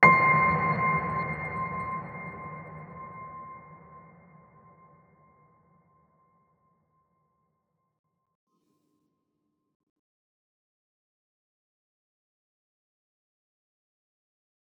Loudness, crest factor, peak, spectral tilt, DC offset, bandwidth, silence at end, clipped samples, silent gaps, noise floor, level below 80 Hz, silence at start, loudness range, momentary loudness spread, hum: -26 LUFS; 30 dB; -4 dBFS; -8 dB/octave; under 0.1%; 7 kHz; 10.6 s; under 0.1%; none; -79 dBFS; -62 dBFS; 0 s; 23 LU; 23 LU; none